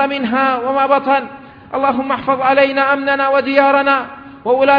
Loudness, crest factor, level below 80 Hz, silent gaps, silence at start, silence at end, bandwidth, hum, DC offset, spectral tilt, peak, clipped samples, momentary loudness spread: -14 LUFS; 14 dB; -56 dBFS; none; 0 s; 0 s; 5.2 kHz; none; under 0.1%; -7 dB/octave; 0 dBFS; under 0.1%; 6 LU